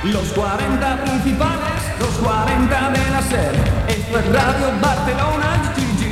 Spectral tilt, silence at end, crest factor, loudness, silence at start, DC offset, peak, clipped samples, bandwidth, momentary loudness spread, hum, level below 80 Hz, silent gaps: -5.5 dB/octave; 0 s; 14 dB; -18 LUFS; 0 s; under 0.1%; -2 dBFS; under 0.1%; 16 kHz; 3 LU; none; -26 dBFS; none